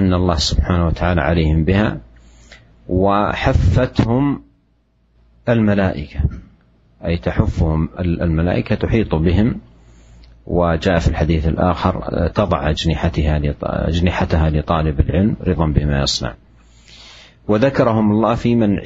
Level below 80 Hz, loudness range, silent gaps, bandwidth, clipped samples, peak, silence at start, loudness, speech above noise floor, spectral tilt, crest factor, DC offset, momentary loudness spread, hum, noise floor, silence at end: -26 dBFS; 2 LU; none; 8 kHz; under 0.1%; 0 dBFS; 0 s; -17 LUFS; 43 dB; -7 dB/octave; 16 dB; under 0.1%; 6 LU; none; -59 dBFS; 0 s